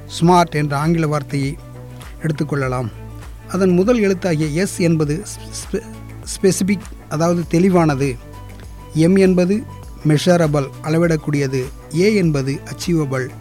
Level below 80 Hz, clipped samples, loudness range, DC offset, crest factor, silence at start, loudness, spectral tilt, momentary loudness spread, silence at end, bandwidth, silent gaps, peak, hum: -38 dBFS; under 0.1%; 3 LU; 0.3%; 14 dB; 0 s; -17 LUFS; -6.5 dB/octave; 19 LU; 0 s; 16 kHz; none; -4 dBFS; none